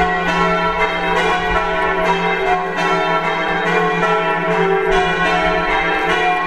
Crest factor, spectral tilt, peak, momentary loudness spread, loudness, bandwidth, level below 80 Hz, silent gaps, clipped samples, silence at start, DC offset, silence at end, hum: 14 dB; -5 dB/octave; -2 dBFS; 2 LU; -16 LUFS; 13 kHz; -34 dBFS; none; under 0.1%; 0 s; 1%; 0 s; none